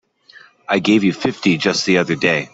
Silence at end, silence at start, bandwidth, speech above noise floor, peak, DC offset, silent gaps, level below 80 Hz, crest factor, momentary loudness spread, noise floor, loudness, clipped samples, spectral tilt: 0.05 s; 0.35 s; 8 kHz; 30 dB; -2 dBFS; under 0.1%; none; -58 dBFS; 16 dB; 4 LU; -47 dBFS; -16 LUFS; under 0.1%; -4.5 dB/octave